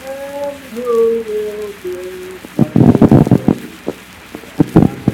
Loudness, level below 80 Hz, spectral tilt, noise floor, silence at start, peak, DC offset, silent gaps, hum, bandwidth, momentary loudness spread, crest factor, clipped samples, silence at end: -13 LUFS; -36 dBFS; -8.5 dB/octave; -33 dBFS; 0 s; 0 dBFS; under 0.1%; none; none; 17 kHz; 19 LU; 14 dB; 0.8%; 0 s